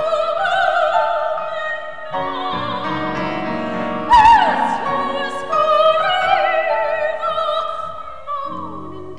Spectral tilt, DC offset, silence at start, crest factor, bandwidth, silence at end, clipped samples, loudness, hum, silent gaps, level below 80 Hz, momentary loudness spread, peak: -4.5 dB/octave; 2%; 0 s; 16 dB; 10.5 kHz; 0 s; under 0.1%; -17 LUFS; none; none; -46 dBFS; 13 LU; -2 dBFS